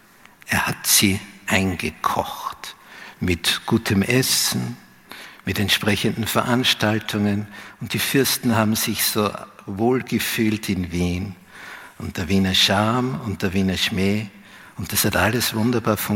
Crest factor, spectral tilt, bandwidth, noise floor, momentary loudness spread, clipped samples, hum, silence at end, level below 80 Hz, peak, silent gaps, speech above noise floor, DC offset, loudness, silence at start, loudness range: 20 dB; -3.5 dB/octave; 17 kHz; -45 dBFS; 19 LU; under 0.1%; none; 0 s; -48 dBFS; -2 dBFS; none; 24 dB; under 0.1%; -20 LUFS; 0.45 s; 2 LU